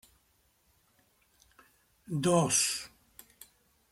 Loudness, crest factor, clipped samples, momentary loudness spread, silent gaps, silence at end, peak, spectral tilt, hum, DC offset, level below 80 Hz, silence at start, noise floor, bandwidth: -28 LUFS; 22 dB; under 0.1%; 22 LU; none; 1.05 s; -14 dBFS; -3.5 dB/octave; none; under 0.1%; -68 dBFS; 2.1 s; -71 dBFS; 16 kHz